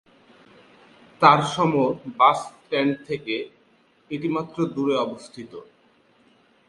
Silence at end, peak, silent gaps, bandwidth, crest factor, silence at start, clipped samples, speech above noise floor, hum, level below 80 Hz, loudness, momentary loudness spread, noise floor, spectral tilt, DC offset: 1.05 s; 0 dBFS; none; 11.5 kHz; 24 dB; 1.2 s; under 0.1%; 38 dB; none; -66 dBFS; -22 LUFS; 22 LU; -60 dBFS; -5.5 dB/octave; under 0.1%